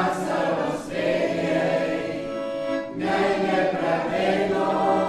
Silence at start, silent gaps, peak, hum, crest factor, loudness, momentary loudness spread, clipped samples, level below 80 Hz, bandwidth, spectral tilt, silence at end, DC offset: 0 s; none; -8 dBFS; none; 14 dB; -24 LUFS; 6 LU; under 0.1%; -56 dBFS; 13 kHz; -6 dB/octave; 0 s; under 0.1%